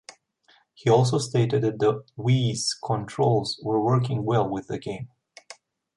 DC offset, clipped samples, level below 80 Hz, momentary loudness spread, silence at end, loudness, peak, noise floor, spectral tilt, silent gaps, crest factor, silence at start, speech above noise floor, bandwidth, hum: under 0.1%; under 0.1%; -60 dBFS; 11 LU; 0.45 s; -24 LUFS; -8 dBFS; -62 dBFS; -6 dB/octave; none; 18 dB; 0.85 s; 38 dB; 11.5 kHz; none